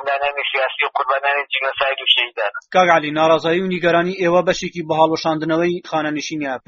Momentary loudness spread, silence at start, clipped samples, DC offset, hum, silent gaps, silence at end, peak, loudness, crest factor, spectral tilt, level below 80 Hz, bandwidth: 7 LU; 0 s; under 0.1%; under 0.1%; none; none; 0.1 s; 0 dBFS; -17 LUFS; 18 dB; -2 dB/octave; -56 dBFS; 7.4 kHz